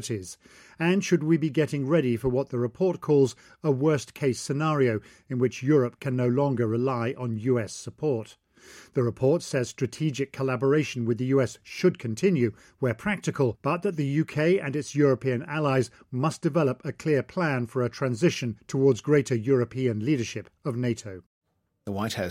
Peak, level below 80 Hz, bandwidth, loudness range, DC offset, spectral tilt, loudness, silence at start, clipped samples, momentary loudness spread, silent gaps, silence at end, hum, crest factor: -10 dBFS; -60 dBFS; 15 kHz; 3 LU; under 0.1%; -6.5 dB/octave; -26 LUFS; 0 s; under 0.1%; 8 LU; 21.26-21.41 s; 0 s; none; 16 dB